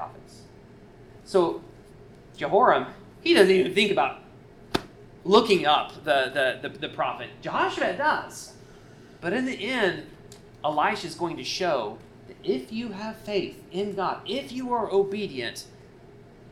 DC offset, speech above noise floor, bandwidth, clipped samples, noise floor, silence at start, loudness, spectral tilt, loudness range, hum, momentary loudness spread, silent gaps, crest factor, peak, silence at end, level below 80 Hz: under 0.1%; 24 dB; 14 kHz; under 0.1%; -49 dBFS; 0 s; -25 LUFS; -4.5 dB/octave; 7 LU; none; 16 LU; none; 24 dB; -4 dBFS; 0.35 s; -58 dBFS